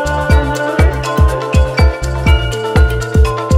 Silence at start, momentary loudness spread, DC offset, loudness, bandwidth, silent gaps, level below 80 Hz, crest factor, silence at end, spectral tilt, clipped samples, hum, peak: 0 s; 2 LU; under 0.1%; -13 LUFS; 15 kHz; none; -14 dBFS; 12 dB; 0 s; -6 dB/octave; under 0.1%; none; 0 dBFS